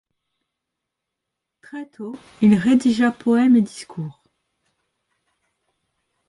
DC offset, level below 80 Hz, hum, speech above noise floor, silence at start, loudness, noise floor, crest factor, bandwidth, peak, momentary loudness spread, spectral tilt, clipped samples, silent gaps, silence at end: under 0.1%; -60 dBFS; none; 64 dB; 1.75 s; -17 LUFS; -82 dBFS; 18 dB; 11.5 kHz; -4 dBFS; 20 LU; -6.5 dB/octave; under 0.1%; none; 2.15 s